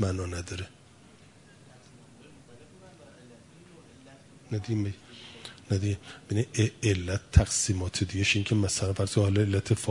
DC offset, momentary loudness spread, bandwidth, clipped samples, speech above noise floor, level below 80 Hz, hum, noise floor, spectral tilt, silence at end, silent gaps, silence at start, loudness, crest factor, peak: under 0.1%; 15 LU; 11 kHz; under 0.1%; 27 dB; -42 dBFS; none; -55 dBFS; -5 dB/octave; 0 s; none; 0 s; -28 LUFS; 24 dB; -4 dBFS